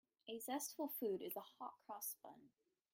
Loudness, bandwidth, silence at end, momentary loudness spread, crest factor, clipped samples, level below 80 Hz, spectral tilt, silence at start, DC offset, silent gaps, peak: -48 LUFS; 16.5 kHz; 0.45 s; 11 LU; 18 dB; under 0.1%; under -90 dBFS; -3 dB/octave; 0.25 s; under 0.1%; none; -32 dBFS